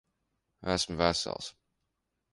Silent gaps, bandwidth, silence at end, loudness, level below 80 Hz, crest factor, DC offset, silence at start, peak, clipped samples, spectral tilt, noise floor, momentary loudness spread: none; 11.5 kHz; 0.8 s; -31 LUFS; -54 dBFS; 26 dB; under 0.1%; 0.6 s; -10 dBFS; under 0.1%; -3.5 dB/octave; -82 dBFS; 13 LU